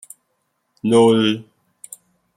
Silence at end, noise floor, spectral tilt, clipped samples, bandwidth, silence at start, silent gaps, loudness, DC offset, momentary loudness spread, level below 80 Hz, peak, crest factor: 0.95 s; -70 dBFS; -5.5 dB/octave; under 0.1%; 15.5 kHz; 0.85 s; none; -16 LUFS; under 0.1%; 25 LU; -64 dBFS; -4 dBFS; 16 dB